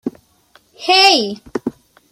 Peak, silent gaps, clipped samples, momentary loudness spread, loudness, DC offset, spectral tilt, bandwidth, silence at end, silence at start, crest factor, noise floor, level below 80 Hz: 0 dBFS; none; under 0.1%; 19 LU; -13 LUFS; under 0.1%; -2 dB/octave; 16 kHz; 0.4 s; 0.05 s; 18 dB; -53 dBFS; -58 dBFS